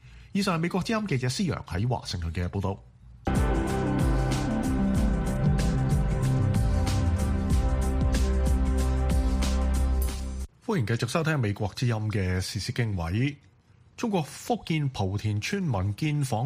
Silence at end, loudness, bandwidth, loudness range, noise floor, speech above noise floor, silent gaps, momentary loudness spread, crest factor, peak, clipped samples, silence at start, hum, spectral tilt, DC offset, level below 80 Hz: 0 s; -28 LUFS; 15.5 kHz; 4 LU; -49 dBFS; 22 dB; none; 5 LU; 16 dB; -10 dBFS; under 0.1%; 0.05 s; none; -6 dB/octave; under 0.1%; -30 dBFS